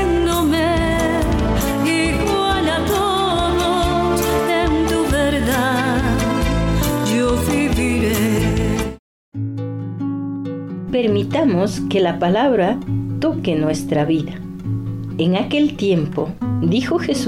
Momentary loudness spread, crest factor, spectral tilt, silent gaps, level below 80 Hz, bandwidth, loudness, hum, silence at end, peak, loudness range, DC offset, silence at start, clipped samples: 8 LU; 10 dB; -5.5 dB/octave; 8.99-9.32 s; -30 dBFS; 17.5 kHz; -18 LUFS; none; 0 s; -8 dBFS; 3 LU; under 0.1%; 0 s; under 0.1%